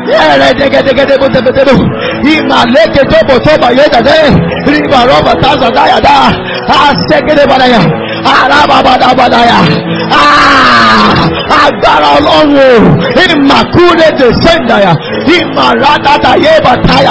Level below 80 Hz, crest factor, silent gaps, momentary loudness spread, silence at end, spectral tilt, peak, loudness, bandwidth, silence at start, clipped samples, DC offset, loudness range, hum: -28 dBFS; 4 dB; none; 4 LU; 0 s; -5.5 dB/octave; 0 dBFS; -5 LUFS; 8 kHz; 0 s; 9%; 1%; 2 LU; none